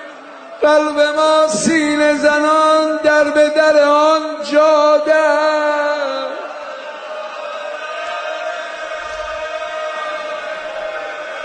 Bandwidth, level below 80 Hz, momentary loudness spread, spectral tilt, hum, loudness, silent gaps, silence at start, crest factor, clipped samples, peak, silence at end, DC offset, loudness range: 9.4 kHz; -56 dBFS; 15 LU; -3 dB/octave; none; -15 LUFS; none; 0 s; 14 dB; under 0.1%; -2 dBFS; 0 s; under 0.1%; 12 LU